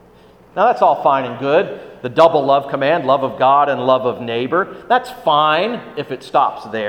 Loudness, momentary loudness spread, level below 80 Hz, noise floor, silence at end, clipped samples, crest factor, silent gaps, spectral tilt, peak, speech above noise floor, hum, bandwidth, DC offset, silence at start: -16 LUFS; 9 LU; -58 dBFS; -46 dBFS; 0 s; under 0.1%; 16 dB; none; -6 dB/octave; 0 dBFS; 30 dB; none; 12 kHz; under 0.1%; 0.55 s